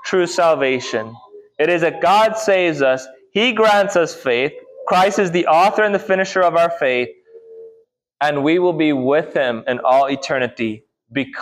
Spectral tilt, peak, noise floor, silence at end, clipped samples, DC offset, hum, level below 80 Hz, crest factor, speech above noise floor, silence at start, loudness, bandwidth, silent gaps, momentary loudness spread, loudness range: -4.5 dB/octave; -4 dBFS; -53 dBFS; 0 s; under 0.1%; under 0.1%; none; -64 dBFS; 12 dB; 37 dB; 0 s; -17 LUFS; 15 kHz; none; 10 LU; 2 LU